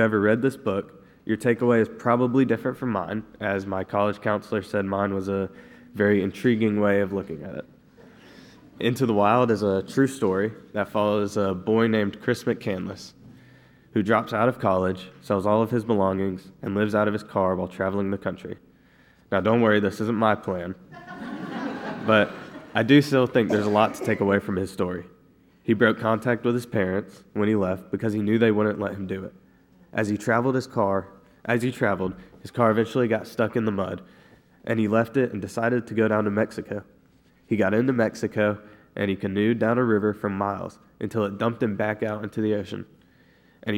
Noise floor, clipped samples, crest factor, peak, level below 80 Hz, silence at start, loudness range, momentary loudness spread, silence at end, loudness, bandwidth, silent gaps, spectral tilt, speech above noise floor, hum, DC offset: -58 dBFS; under 0.1%; 20 dB; -4 dBFS; -62 dBFS; 0 s; 3 LU; 13 LU; 0 s; -24 LUFS; 16.5 kHz; none; -7 dB/octave; 35 dB; none; under 0.1%